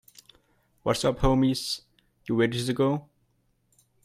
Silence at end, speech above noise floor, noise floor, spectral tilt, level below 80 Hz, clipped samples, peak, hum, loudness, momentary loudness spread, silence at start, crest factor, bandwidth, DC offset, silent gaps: 1.05 s; 45 dB; -70 dBFS; -5.5 dB/octave; -42 dBFS; under 0.1%; -10 dBFS; none; -26 LUFS; 10 LU; 0.85 s; 18 dB; 15.5 kHz; under 0.1%; none